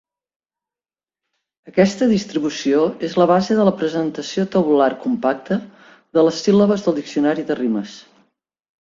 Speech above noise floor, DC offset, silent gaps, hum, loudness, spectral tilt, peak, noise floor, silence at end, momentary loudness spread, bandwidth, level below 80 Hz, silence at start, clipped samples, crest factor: over 73 dB; under 0.1%; none; none; -18 LUFS; -6 dB/octave; -2 dBFS; under -90 dBFS; 0.8 s; 8 LU; 7.8 kHz; -60 dBFS; 1.65 s; under 0.1%; 18 dB